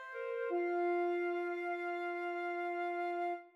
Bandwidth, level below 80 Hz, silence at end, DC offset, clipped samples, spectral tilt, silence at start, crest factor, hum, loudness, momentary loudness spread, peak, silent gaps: 6 kHz; under -90 dBFS; 0.05 s; under 0.1%; under 0.1%; -4 dB/octave; 0 s; 10 dB; none; -38 LUFS; 4 LU; -26 dBFS; none